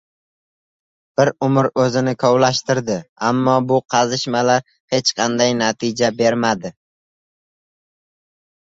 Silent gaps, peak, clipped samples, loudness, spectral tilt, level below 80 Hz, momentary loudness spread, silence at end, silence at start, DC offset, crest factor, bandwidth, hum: 3.09-3.16 s, 4.80-4.88 s; -2 dBFS; under 0.1%; -17 LUFS; -4.5 dB/octave; -58 dBFS; 5 LU; 1.9 s; 1.2 s; under 0.1%; 16 dB; 8 kHz; none